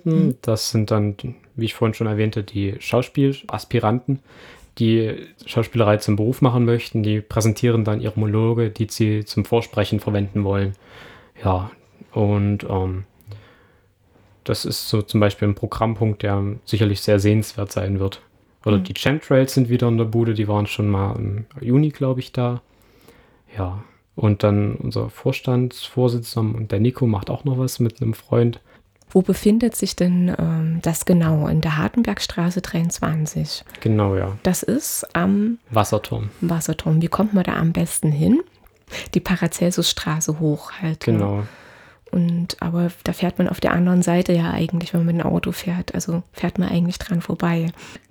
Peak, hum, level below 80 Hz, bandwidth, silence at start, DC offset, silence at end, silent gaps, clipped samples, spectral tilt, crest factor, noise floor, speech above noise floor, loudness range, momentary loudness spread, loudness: -2 dBFS; none; -46 dBFS; 19.5 kHz; 0.05 s; under 0.1%; 0.15 s; none; under 0.1%; -6 dB/octave; 18 dB; -57 dBFS; 37 dB; 4 LU; 8 LU; -21 LUFS